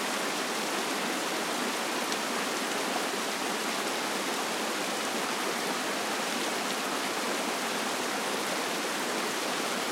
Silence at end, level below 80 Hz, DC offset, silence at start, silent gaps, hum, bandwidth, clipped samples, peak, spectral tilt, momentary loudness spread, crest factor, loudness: 0 s; -82 dBFS; under 0.1%; 0 s; none; none; 16 kHz; under 0.1%; -12 dBFS; -1.5 dB/octave; 0 LU; 20 dB; -30 LUFS